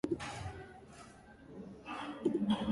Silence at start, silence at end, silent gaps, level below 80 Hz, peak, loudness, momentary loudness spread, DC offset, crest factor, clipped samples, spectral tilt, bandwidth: 0.05 s; 0 s; none; -60 dBFS; -20 dBFS; -39 LUFS; 20 LU; under 0.1%; 18 dB; under 0.1%; -6 dB/octave; 11.5 kHz